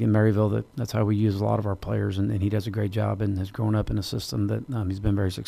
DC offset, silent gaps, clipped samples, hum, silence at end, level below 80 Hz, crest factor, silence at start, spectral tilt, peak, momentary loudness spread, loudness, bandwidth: under 0.1%; none; under 0.1%; none; 0 s; -44 dBFS; 14 dB; 0 s; -7.5 dB/octave; -10 dBFS; 6 LU; -26 LUFS; 14.5 kHz